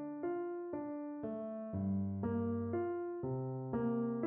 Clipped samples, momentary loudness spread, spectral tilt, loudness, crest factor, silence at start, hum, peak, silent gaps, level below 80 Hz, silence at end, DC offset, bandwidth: under 0.1%; 6 LU; -11 dB/octave; -40 LUFS; 14 dB; 0 s; none; -26 dBFS; none; -70 dBFS; 0 s; under 0.1%; 3 kHz